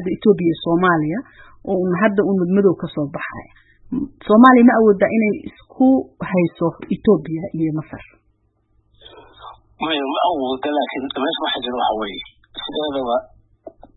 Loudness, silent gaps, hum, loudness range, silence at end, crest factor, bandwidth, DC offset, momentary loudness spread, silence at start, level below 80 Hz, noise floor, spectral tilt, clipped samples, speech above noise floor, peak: -18 LUFS; none; none; 9 LU; 0.7 s; 18 dB; 4.1 kHz; under 0.1%; 15 LU; 0 s; -52 dBFS; -63 dBFS; -9.5 dB/octave; under 0.1%; 45 dB; 0 dBFS